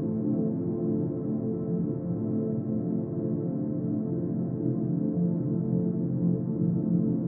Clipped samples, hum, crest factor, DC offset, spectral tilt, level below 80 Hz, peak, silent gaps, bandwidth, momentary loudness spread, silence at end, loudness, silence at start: under 0.1%; none; 12 dB; under 0.1%; -13.5 dB/octave; -60 dBFS; -14 dBFS; none; 1.9 kHz; 3 LU; 0 s; -29 LUFS; 0 s